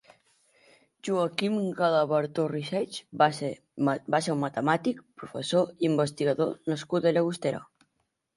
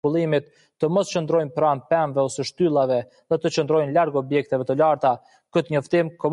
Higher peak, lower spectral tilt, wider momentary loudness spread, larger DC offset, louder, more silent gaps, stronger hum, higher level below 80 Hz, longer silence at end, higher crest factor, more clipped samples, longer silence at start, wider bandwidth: about the same, -8 dBFS vs -8 dBFS; about the same, -6 dB/octave vs -6 dB/octave; first, 10 LU vs 6 LU; neither; second, -28 LUFS vs -22 LUFS; neither; neither; second, -72 dBFS vs -66 dBFS; first, 0.75 s vs 0 s; first, 20 dB vs 14 dB; neither; first, 1.05 s vs 0.05 s; about the same, 11.5 kHz vs 11 kHz